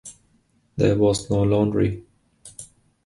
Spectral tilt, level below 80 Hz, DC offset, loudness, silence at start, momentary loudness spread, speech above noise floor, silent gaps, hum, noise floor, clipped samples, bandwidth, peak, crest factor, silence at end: -6.5 dB/octave; -44 dBFS; under 0.1%; -21 LUFS; 0.05 s; 22 LU; 43 dB; none; none; -63 dBFS; under 0.1%; 11.5 kHz; -4 dBFS; 18 dB; 0.4 s